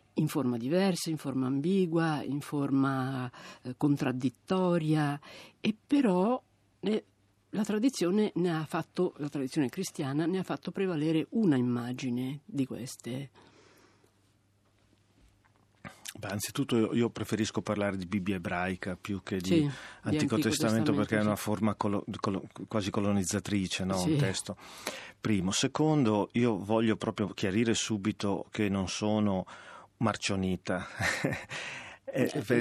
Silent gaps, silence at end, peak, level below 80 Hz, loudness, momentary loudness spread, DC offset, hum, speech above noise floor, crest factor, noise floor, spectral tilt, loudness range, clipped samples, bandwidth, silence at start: none; 0 s; -12 dBFS; -68 dBFS; -31 LUFS; 10 LU; under 0.1%; none; 38 dB; 20 dB; -68 dBFS; -5.5 dB/octave; 5 LU; under 0.1%; 14 kHz; 0.15 s